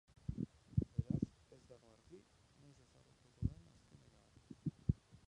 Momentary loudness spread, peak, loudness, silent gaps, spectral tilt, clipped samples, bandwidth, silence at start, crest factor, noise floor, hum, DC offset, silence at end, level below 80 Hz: 25 LU; -20 dBFS; -44 LUFS; none; -9.5 dB/octave; under 0.1%; 10.5 kHz; 0.3 s; 26 dB; -69 dBFS; none; under 0.1%; 0.35 s; -56 dBFS